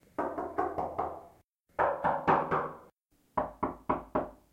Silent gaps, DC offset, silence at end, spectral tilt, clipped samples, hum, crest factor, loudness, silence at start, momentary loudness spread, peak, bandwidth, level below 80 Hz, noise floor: 1.44-1.53 s, 2.92-2.96 s; under 0.1%; 0.15 s; -8 dB/octave; under 0.1%; none; 20 dB; -33 LUFS; 0.2 s; 12 LU; -12 dBFS; 16 kHz; -58 dBFS; -68 dBFS